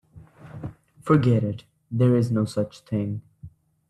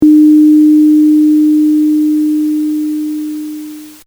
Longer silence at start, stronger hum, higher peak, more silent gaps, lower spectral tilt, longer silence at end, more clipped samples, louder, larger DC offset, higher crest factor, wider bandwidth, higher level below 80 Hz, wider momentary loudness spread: first, 0.15 s vs 0 s; neither; second, -6 dBFS vs 0 dBFS; neither; first, -8.5 dB/octave vs -6 dB/octave; first, 0.4 s vs 0.15 s; neither; second, -23 LUFS vs -9 LUFS; neither; first, 20 dB vs 8 dB; second, 11.5 kHz vs over 20 kHz; about the same, -58 dBFS vs -54 dBFS; first, 19 LU vs 16 LU